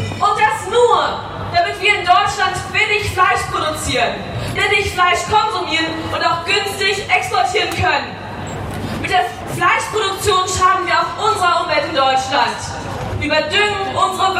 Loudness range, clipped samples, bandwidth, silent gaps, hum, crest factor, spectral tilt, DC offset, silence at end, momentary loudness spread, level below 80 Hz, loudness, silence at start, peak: 2 LU; under 0.1%; 16 kHz; none; none; 16 dB; -3 dB/octave; under 0.1%; 0 s; 9 LU; -40 dBFS; -16 LUFS; 0 s; -2 dBFS